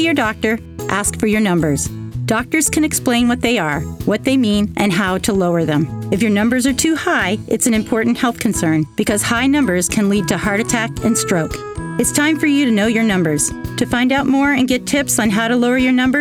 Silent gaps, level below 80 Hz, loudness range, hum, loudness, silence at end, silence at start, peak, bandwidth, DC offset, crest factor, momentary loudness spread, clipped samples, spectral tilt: none; -40 dBFS; 1 LU; none; -16 LUFS; 0 s; 0 s; 0 dBFS; 17 kHz; under 0.1%; 16 dB; 5 LU; under 0.1%; -4 dB/octave